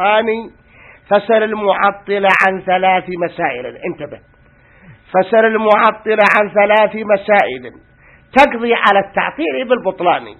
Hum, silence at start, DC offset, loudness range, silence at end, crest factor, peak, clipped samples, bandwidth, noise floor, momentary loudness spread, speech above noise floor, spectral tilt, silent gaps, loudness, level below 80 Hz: none; 0 s; under 0.1%; 4 LU; 0.05 s; 14 dB; 0 dBFS; under 0.1%; 10.5 kHz; -47 dBFS; 10 LU; 34 dB; -5.5 dB/octave; none; -13 LUFS; -52 dBFS